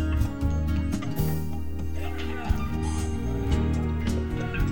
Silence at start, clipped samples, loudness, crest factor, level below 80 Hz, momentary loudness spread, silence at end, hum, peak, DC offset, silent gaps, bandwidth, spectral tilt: 0 s; under 0.1%; -29 LUFS; 16 dB; -32 dBFS; 6 LU; 0 s; none; -10 dBFS; under 0.1%; none; 18 kHz; -7 dB/octave